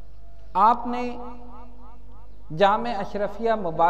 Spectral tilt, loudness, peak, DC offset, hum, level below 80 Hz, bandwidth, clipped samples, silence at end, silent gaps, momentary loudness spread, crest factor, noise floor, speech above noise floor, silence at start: -6.5 dB/octave; -23 LUFS; -6 dBFS; 3%; none; -46 dBFS; 8.6 kHz; under 0.1%; 0 s; none; 20 LU; 20 dB; -46 dBFS; 23 dB; 0.05 s